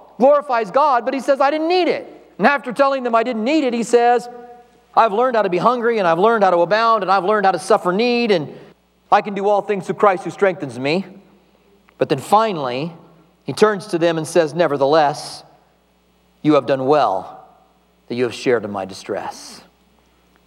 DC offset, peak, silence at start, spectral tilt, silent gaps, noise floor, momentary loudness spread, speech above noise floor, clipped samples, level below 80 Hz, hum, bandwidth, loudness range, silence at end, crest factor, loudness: under 0.1%; 0 dBFS; 0.2 s; -5.5 dB/octave; none; -58 dBFS; 12 LU; 41 dB; under 0.1%; -66 dBFS; none; 13 kHz; 5 LU; 0.85 s; 18 dB; -17 LUFS